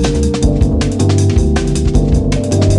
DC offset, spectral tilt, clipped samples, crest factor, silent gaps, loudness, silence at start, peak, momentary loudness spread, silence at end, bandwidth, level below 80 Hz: under 0.1%; -6.5 dB/octave; under 0.1%; 10 dB; none; -13 LUFS; 0 s; 0 dBFS; 2 LU; 0 s; 11.5 kHz; -16 dBFS